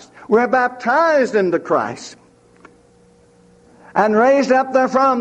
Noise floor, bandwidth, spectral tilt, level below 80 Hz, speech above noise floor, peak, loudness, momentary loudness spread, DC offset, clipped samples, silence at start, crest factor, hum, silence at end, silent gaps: -51 dBFS; 9 kHz; -5.5 dB/octave; -62 dBFS; 36 dB; -2 dBFS; -16 LUFS; 9 LU; under 0.1%; under 0.1%; 0.2 s; 16 dB; none; 0 s; none